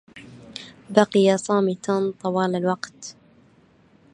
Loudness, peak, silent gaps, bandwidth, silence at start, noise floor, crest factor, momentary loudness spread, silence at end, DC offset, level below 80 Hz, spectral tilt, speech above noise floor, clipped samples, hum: -22 LUFS; -2 dBFS; none; 10.5 kHz; 0.15 s; -56 dBFS; 22 dB; 21 LU; 1 s; under 0.1%; -68 dBFS; -5.5 dB/octave; 35 dB; under 0.1%; none